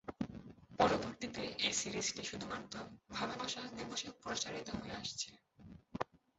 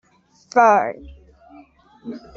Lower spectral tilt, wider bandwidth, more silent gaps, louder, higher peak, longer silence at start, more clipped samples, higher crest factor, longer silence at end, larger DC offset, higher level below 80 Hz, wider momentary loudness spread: second, -2.5 dB/octave vs -5 dB/octave; about the same, 8 kHz vs 7.4 kHz; neither; second, -40 LUFS vs -17 LUFS; second, -18 dBFS vs -2 dBFS; second, 0.05 s vs 0.55 s; neither; about the same, 24 dB vs 20 dB; first, 0.35 s vs 0.2 s; neither; second, -66 dBFS vs -52 dBFS; second, 14 LU vs 24 LU